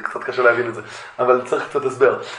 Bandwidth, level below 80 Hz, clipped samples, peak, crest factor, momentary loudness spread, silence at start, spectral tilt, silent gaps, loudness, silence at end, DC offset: 11 kHz; -66 dBFS; under 0.1%; -2 dBFS; 18 dB; 11 LU; 0 s; -5 dB/octave; none; -19 LUFS; 0 s; under 0.1%